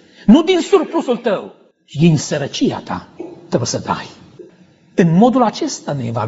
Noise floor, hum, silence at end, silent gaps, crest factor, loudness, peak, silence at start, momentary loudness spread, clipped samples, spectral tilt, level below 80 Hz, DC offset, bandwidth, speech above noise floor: -48 dBFS; none; 0 s; none; 16 dB; -16 LUFS; 0 dBFS; 0.25 s; 16 LU; under 0.1%; -6 dB/octave; -48 dBFS; under 0.1%; 8 kHz; 33 dB